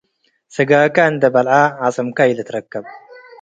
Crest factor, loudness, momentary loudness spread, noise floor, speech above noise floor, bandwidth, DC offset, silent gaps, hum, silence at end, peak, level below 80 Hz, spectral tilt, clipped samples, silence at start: 16 dB; -15 LUFS; 15 LU; -59 dBFS; 44 dB; 9 kHz; under 0.1%; none; none; 0.45 s; 0 dBFS; -64 dBFS; -6 dB/octave; under 0.1%; 0.55 s